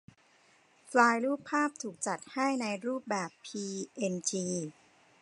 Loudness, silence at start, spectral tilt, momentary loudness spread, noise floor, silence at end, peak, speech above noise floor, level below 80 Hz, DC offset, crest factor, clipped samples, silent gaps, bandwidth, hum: -32 LUFS; 0.85 s; -4 dB/octave; 12 LU; -65 dBFS; 0.5 s; -8 dBFS; 33 dB; -82 dBFS; under 0.1%; 24 dB; under 0.1%; none; 11 kHz; none